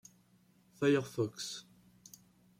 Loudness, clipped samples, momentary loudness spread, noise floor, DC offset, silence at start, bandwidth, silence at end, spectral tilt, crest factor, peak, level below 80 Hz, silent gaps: -35 LUFS; under 0.1%; 25 LU; -68 dBFS; under 0.1%; 0.8 s; 16 kHz; 1 s; -5 dB/octave; 20 dB; -18 dBFS; -78 dBFS; none